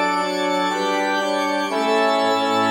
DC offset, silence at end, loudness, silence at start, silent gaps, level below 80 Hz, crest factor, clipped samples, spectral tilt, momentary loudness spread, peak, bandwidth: under 0.1%; 0 s; -20 LUFS; 0 s; none; -66 dBFS; 12 dB; under 0.1%; -3.5 dB/octave; 3 LU; -8 dBFS; 16.5 kHz